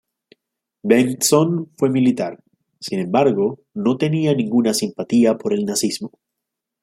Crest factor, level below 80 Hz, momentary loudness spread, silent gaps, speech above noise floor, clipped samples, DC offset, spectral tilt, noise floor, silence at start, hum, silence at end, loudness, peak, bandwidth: 18 dB; -64 dBFS; 11 LU; none; 64 dB; under 0.1%; under 0.1%; -5 dB/octave; -82 dBFS; 0.85 s; none; 0.75 s; -19 LUFS; -2 dBFS; 16.5 kHz